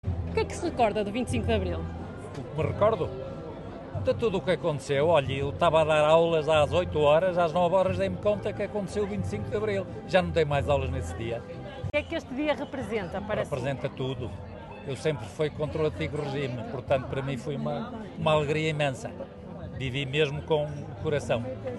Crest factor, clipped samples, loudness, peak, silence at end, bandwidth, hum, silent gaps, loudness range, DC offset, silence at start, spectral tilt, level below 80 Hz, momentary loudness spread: 20 dB; under 0.1%; -28 LUFS; -8 dBFS; 0 s; 12 kHz; none; none; 8 LU; under 0.1%; 0.05 s; -6.5 dB/octave; -48 dBFS; 14 LU